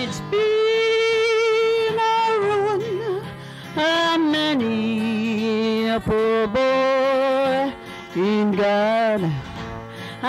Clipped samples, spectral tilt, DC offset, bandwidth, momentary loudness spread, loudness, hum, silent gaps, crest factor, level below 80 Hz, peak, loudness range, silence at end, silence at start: under 0.1%; -5.5 dB/octave; under 0.1%; 13 kHz; 11 LU; -20 LUFS; none; none; 10 dB; -52 dBFS; -10 dBFS; 2 LU; 0 s; 0 s